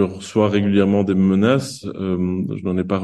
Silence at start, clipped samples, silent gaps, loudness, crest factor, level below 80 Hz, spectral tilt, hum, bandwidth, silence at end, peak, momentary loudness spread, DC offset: 0 s; under 0.1%; none; -19 LUFS; 16 dB; -52 dBFS; -7 dB/octave; none; 12 kHz; 0 s; -2 dBFS; 8 LU; under 0.1%